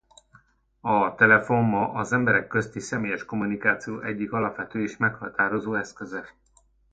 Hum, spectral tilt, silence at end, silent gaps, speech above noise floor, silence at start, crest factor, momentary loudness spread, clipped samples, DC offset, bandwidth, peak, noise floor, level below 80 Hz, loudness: none; -6.5 dB/octave; 0.65 s; none; 38 dB; 0.85 s; 22 dB; 12 LU; under 0.1%; under 0.1%; 9.2 kHz; -4 dBFS; -62 dBFS; -60 dBFS; -24 LUFS